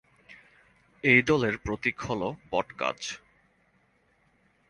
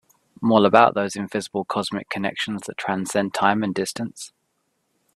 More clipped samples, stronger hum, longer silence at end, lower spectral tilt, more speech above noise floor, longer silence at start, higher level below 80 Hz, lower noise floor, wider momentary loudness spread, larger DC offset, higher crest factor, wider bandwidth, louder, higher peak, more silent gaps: neither; neither; first, 1.55 s vs 0.9 s; about the same, -5 dB/octave vs -4.5 dB/octave; second, 40 dB vs 50 dB; about the same, 0.3 s vs 0.4 s; first, -54 dBFS vs -64 dBFS; second, -67 dBFS vs -72 dBFS; about the same, 14 LU vs 13 LU; neither; about the same, 24 dB vs 22 dB; second, 11 kHz vs 13.5 kHz; second, -27 LUFS vs -22 LUFS; second, -6 dBFS vs 0 dBFS; neither